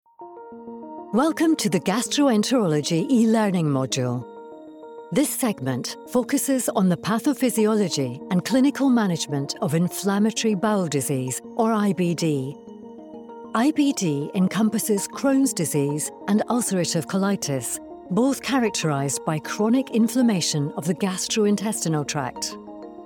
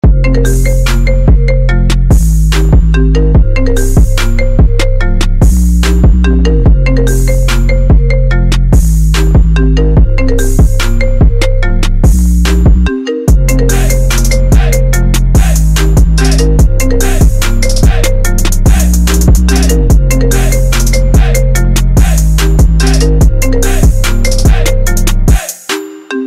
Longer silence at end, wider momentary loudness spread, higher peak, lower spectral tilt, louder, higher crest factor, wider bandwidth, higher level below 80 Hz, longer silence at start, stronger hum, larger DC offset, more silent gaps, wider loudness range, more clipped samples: about the same, 0 s vs 0 s; first, 13 LU vs 4 LU; second, -8 dBFS vs 0 dBFS; about the same, -5 dB/octave vs -5.5 dB/octave; second, -22 LUFS vs -10 LUFS; first, 14 dB vs 6 dB; first, 19 kHz vs 15.5 kHz; second, -64 dBFS vs -8 dBFS; first, 0.2 s vs 0.05 s; neither; neither; neither; about the same, 3 LU vs 1 LU; neither